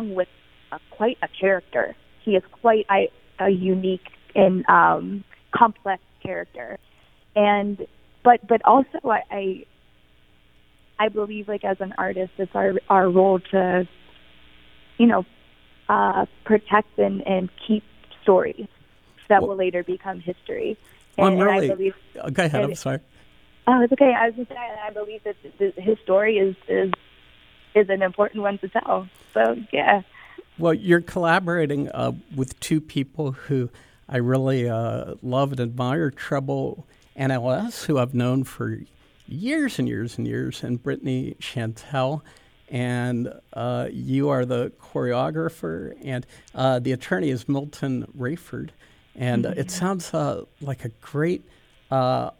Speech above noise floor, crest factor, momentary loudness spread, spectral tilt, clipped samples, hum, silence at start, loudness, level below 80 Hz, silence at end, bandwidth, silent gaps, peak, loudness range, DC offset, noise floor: 36 dB; 22 dB; 14 LU; -6.5 dB/octave; under 0.1%; none; 0 s; -23 LUFS; -58 dBFS; 0.1 s; 16 kHz; none; 0 dBFS; 6 LU; under 0.1%; -58 dBFS